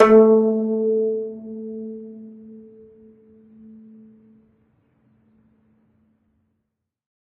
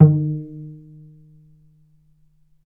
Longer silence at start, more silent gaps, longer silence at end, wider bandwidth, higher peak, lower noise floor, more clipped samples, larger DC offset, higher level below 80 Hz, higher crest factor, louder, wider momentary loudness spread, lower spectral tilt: about the same, 0 s vs 0 s; neither; first, 4.7 s vs 1.95 s; first, 5.4 kHz vs 1.5 kHz; about the same, 0 dBFS vs 0 dBFS; first, -78 dBFS vs -58 dBFS; neither; neither; about the same, -62 dBFS vs -60 dBFS; about the same, 22 dB vs 22 dB; about the same, -19 LUFS vs -20 LUFS; about the same, 29 LU vs 27 LU; second, -8.5 dB/octave vs -15 dB/octave